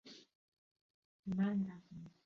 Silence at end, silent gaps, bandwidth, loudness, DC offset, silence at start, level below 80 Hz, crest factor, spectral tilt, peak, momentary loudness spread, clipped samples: 0.15 s; 0.35-0.52 s, 0.58-0.75 s, 0.81-1.23 s; 6.8 kHz; -39 LUFS; under 0.1%; 0.05 s; -76 dBFS; 16 dB; -7.5 dB/octave; -28 dBFS; 21 LU; under 0.1%